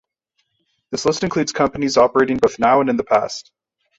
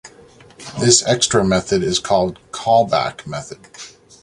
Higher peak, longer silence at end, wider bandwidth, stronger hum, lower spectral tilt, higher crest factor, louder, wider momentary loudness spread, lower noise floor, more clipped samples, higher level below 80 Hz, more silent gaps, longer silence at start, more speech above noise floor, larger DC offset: about the same, -2 dBFS vs 0 dBFS; first, 0.6 s vs 0.35 s; second, 8 kHz vs 11.5 kHz; neither; about the same, -4.5 dB/octave vs -3.5 dB/octave; about the same, 18 dB vs 18 dB; about the same, -17 LUFS vs -16 LUFS; second, 9 LU vs 23 LU; first, -71 dBFS vs -45 dBFS; neither; about the same, -50 dBFS vs -46 dBFS; neither; first, 0.9 s vs 0.05 s; first, 53 dB vs 29 dB; neither